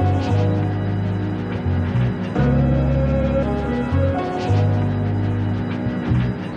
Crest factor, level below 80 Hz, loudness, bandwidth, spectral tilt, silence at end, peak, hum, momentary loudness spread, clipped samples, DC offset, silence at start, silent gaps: 12 dB; -30 dBFS; -20 LUFS; 7 kHz; -9 dB/octave; 0 s; -6 dBFS; none; 5 LU; under 0.1%; under 0.1%; 0 s; none